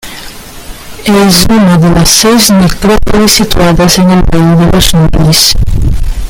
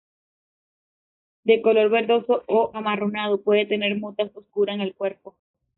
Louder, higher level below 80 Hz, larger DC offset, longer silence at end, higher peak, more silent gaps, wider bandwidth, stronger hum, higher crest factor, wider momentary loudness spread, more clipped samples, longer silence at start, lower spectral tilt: first, -6 LUFS vs -22 LUFS; first, -14 dBFS vs -70 dBFS; neither; second, 0 s vs 0.5 s; first, 0 dBFS vs -6 dBFS; neither; first, over 20 kHz vs 4.1 kHz; neither; second, 6 dB vs 18 dB; first, 19 LU vs 11 LU; first, 1% vs under 0.1%; second, 0.05 s vs 1.45 s; first, -4.5 dB/octave vs -3 dB/octave